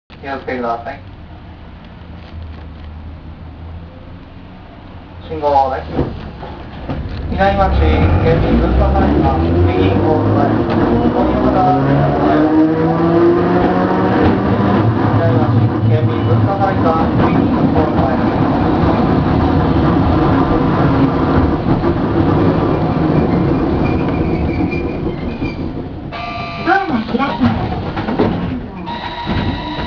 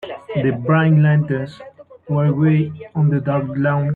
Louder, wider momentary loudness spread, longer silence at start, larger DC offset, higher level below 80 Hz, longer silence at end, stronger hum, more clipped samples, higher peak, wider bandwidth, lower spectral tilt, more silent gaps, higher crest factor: first, -14 LUFS vs -18 LUFS; first, 19 LU vs 10 LU; about the same, 0.1 s vs 0 s; neither; first, -26 dBFS vs -54 dBFS; about the same, 0 s vs 0 s; neither; neither; first, 0 dBFS vs -4 dBFS; first, 5.4 kHz vs 4.3 kHz; about the same, -9.5 dB/octave vs -10.5 dB/octave; neither; about the same, 14 dB vs 14 dB